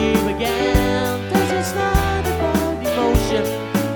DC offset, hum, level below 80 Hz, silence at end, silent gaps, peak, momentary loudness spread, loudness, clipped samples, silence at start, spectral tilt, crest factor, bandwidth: under 0.1%; none; -28 dBFS; 0 s; none; -2 dBFS; 3 LU; -19 LUFS; under 0.1%; 0 s; -5.5 dB/octave; 16 dB; over 20 kHz